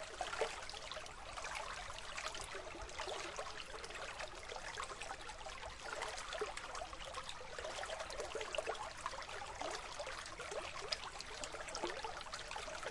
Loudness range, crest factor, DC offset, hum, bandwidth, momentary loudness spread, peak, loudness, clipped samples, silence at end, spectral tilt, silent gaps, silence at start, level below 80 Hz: 2 LU; 24 dB; under 0.1%; none; 11.5 kHz; 5 LU; -22 dBFS; -46 LUFS; under 0.1%; 0 s; -1.5 dB/octave; none; 0 s; -60 dBFS